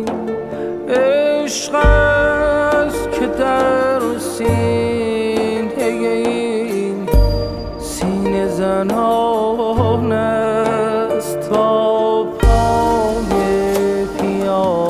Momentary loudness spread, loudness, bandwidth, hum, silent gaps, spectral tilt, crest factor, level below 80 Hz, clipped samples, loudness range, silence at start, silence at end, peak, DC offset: 6 LU; -16 LUFS; 16 kHz; none; none; -5.5 dB/octave; 16 dB; -24 dBFS; under 0.1%; 3 LU; 0 s; 0 s; 0 dBFS; under 0.1%